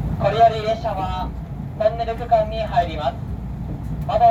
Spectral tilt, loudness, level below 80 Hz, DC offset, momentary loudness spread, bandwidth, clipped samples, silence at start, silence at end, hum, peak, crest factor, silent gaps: -7.5 dB/octave; -22 LUFS; -32 dBFS; under 0.1%; 13 LU; 7.8 kHz; under 0.1%; 0 s; 0 s; none; -4 dBFS; 16 dB; none